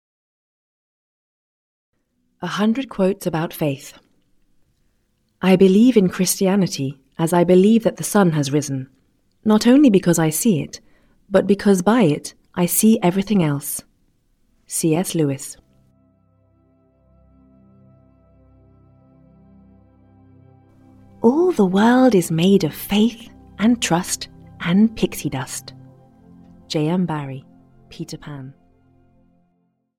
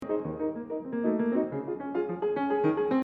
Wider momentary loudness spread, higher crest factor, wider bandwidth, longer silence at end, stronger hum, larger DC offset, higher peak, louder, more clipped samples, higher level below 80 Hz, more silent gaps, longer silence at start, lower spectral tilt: first, 18 LU vs 7 LU; first, 20 dB vs 14 dB; first, 18 kHz vs 4.7 kHz; first, 1.5 s vs 0 s; neither; neither; first, 0 dBFS vs -14 dBFS; first, -18 LUFS vs -30 LUFS; neither; first, -54 dBFS vs -64 dBFS; neither; first, 2.4 s vs 0 s; second, -5.5 dB/octave vs -9.5 dB/octave